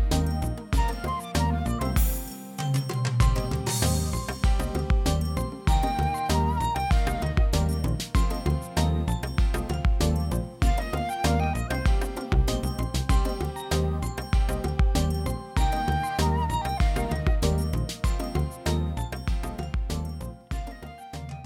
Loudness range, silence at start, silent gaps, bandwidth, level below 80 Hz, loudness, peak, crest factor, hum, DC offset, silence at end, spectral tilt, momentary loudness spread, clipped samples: 2 LU; 0 s; none; 17.5 kHz; -28 dBFS; -27 LUFS; -6 dBFS; 18 dB; none; under 0.1%; 0 s; -5.5 dB/octave; 7 LU; under 0.1%